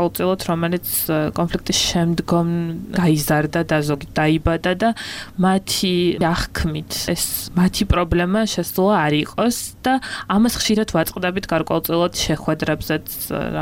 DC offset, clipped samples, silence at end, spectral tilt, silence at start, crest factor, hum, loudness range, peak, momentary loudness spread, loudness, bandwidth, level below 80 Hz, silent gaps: under 0.1%; under 0.1%; 0 s; -4.5 dB/octave; 0 s; 16 dB; none; 1 LU; -2 dBFS; 6 LU; -19 LUFS; 17 kHz; -36 dBFS; none